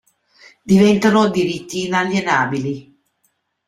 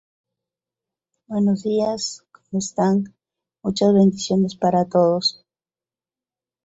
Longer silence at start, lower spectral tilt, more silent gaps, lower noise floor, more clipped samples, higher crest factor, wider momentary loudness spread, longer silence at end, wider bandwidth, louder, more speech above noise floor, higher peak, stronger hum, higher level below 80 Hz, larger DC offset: second, 0.65 s vs 1.3 s; about the same, -5.5 dB/octave vs -6 dB/octave; neither; second, -67 dBFS vs under -90 dBFS; neither; about the same, 16 dB vs 16 dB; about the same, 11 LU vs 12 LU; second, 0.85 s vs 1.35 s; first, 13 kHz vs 8 kHz; first, -16 LUFS vs -20 LUFS; second, 51 dB vs over 71 dB; first, -2 dBFS vs -6 dBFS; neither; first, -54 dBFS vs -62 dBFS; neither